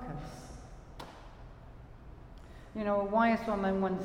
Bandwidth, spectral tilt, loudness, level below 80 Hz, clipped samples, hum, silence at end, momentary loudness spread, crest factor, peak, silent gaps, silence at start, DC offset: 12 kHz; -7 dB/octave; -31 LUFS; -52 dBFS; under 0.1%; none; 0 s; 25 LU; 18 dB; -18 dBFS; none; 0 s; under 0.1%